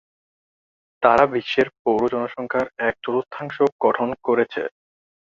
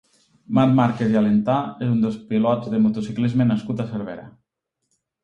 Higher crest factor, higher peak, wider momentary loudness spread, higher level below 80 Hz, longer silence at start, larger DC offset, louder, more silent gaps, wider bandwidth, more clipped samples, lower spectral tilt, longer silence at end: about the same, 20 dB vs 16 dB; about the same, -2 dBFS vs -4 dBFS; about the same, 8 LU vs 9 LU; about the same, -58 dBFS vs -58 dBFS; first, 1 s vs 0.5 s; neither; about the same, -21 LUFS vs -21 LUFS; first, 1.79-1.85 s, 3.72-3.79 s vs none; about the same, 7.6 kHz vs 7.4 kHz; neither; second, -6.5 dB/octave vs -9 dB/octave; second, 0.7 s vs 0.95 s